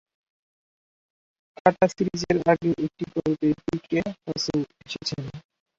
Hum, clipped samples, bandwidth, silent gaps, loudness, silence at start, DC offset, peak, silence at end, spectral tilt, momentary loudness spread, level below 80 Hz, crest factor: none; under 0.1%; 7.8 kHz; none; -25 LUFS; 1.65 s; under 0.1%; -2 dBFS; 0.4 s; -5.5 dB/octave; 10 LU; -56 dBFS; 24 dB